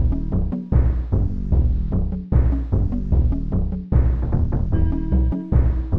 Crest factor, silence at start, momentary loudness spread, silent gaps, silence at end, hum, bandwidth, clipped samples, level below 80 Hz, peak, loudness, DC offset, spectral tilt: 14 dB; 0 s; 4 LU; none; 0 s; none; 2.4 kHz; under 0.1%; -20 dBFS; -6 dBFS; -22 LUFS; under 0.1%; -12 dB/octave